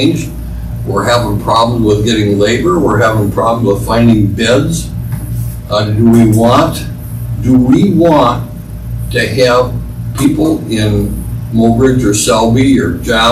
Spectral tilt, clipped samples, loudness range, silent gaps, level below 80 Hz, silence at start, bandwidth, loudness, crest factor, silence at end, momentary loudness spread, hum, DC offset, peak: -6 dB/octave; under 0.1%; 2 LU; none; -26 dBFS; 0 s; 15 kHz; -11 LUFS; 10 dB; 0 s; 13 LU; none; under 0.1%; 0 dBFS